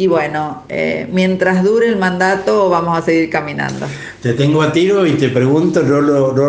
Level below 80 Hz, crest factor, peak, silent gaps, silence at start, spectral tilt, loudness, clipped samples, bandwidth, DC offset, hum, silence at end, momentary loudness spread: -50 dBFS; 14 dB; 0 dBFS; none; 0 s; -6.5 dB/octave; -14 LUFS; under 0.1%; 9.4 kHz; under 0.1%; none; 0 s; 8 LU